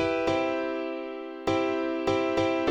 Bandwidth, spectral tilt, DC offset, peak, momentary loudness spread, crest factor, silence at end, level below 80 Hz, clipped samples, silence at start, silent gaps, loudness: 8.8 kHz; -5.5 dB/octave; under 0.1%; -14 dBFS; 8 LU; 14 dB; 0 s; -56 dBFS; under 0.1%; 0 s; none; -28 LUFS